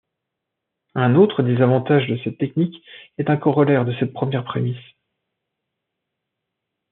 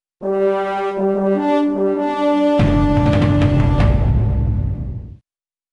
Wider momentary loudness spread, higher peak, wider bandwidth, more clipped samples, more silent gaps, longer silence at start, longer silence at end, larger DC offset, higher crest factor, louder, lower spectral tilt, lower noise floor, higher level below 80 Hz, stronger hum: first, 11 LU vs 7 LU; about the same, -2 dBFS vs -4 dBFS; second, 4.1 kHz vs 9.8 kHz; neither; neither; first, 0.95 s vs 0.2 s; first, 2.1 s vs 0.55 s; neither; first, 18 dB vs 12 dB; about the same, -19 LUFS vs -17 LUFS; second, -7 dB/octave vs -9 dB/octave; second, -81 dBFS vs under -90 dBFS; second, -68 dBFS vs -24 dBFS; neither